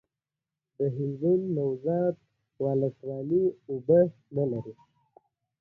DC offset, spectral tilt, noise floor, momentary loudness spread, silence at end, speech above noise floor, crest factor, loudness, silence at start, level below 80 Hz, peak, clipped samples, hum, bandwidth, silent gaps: under 0.1%; -12.5 dB/octave; -89 dBFS; 12 LU; 0.9 s; 62 dB; 18 dB; -28 LUFS; 0.8 s; -68 dBFS; -10 dBFS; under 0.1%; none; 2.8 kHz; none